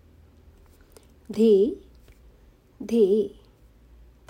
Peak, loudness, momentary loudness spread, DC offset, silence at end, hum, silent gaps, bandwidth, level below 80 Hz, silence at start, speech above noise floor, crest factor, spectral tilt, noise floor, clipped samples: -10 dBFS; -22 LUFS; 19 LU; under 0.1%; 1 s; none; none; 15.5 kHz; -56 dBFS; 1.3 s; 34 dB; 16 dB; -7.5 dB/octave; -55 dBFS; under 0.1%